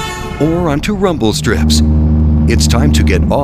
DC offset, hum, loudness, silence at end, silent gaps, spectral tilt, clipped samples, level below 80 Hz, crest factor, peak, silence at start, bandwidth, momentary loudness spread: under 0.1%; none; -12 LUFS; 0 s; none; -5.5 dB/octave; under 0.1%; -16 dBFS; 10 dB; 0 dBFS; 0 s; 15.5 kHz; 4 LU